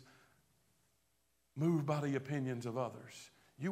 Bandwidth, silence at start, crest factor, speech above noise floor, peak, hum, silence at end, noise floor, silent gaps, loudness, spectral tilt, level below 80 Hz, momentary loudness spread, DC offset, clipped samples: 15 kHz; 0 s; 18 dB; 42 dB; -22 dBFS; none; 0 s; -79 dBFS; none; -38 LUFS; -7.5 dB/octave; -80 dBFS; 18 LU; under 0.1%; under 0.1%